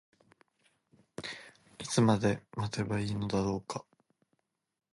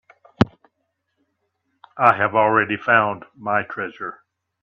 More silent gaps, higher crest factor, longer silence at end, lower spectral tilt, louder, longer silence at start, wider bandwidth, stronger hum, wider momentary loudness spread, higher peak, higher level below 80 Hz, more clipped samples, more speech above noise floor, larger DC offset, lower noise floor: neither; about the same, 22 dB vs 22 dB; first, 1.1 s vs 0.5 s; second, -5.5 dB/octave vs -7.5 dB/octave; second, -33 LUFS vs -19 LUFS; first, 1.2 s vs 0.4 s; first, 11.5 kHz vs 8.2 kHz; neither; first, 18 LU vs 13 LU; second, -12 dBFS vs 0 dBFS; second, -60 dBFS vs -54 dBFS; neither; second, 49 dB vs 55 dB; neither; first, -80 dBFS vs -74 dBFS